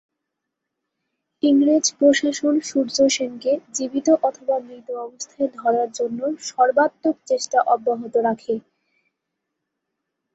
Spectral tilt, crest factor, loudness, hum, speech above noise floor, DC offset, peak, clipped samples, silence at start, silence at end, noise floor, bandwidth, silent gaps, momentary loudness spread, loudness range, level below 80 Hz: -2.5 dB/octave; 18 dB; -20 LUFS; none; 61 dB; under 0.1%; -4 dBFS; under 0.1%; 1.45 s; 1.75 s; -81 dBFS; 8.2 kHz; none; 10 LU; 4 LU; -70 dBFS